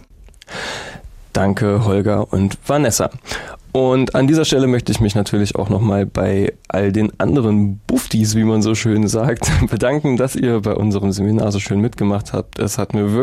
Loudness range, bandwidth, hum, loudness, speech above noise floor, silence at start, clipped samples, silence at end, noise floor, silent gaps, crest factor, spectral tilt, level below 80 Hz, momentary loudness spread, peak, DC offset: 2 LU; 15 kHz; none; -17 LUFS; 27 dB; 0.2 s; under 0.1%; 0 s; -42 dBFS; none; 12 dB; -6 dB/octave; -36 dBFS; 7 LU; -4 dBFS; under 0.1%